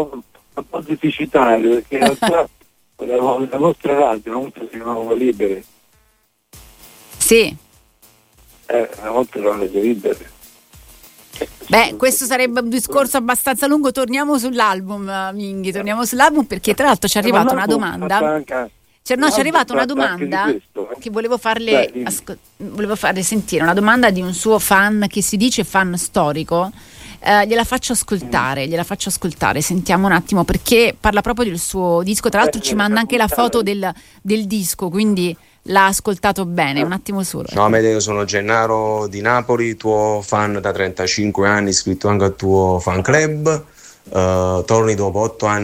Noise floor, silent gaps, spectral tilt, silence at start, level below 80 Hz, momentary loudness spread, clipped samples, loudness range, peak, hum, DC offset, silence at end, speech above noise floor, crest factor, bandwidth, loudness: -60 dBFS; none; -4 dB/octave; 0 s; -42 dBFS; 11 LU; under 0.1%; 4 LU; 0 dBFS; none; under 0.1%; 0 s; 44 dB; 16 dB; 16.5 kHz; -16 LUFS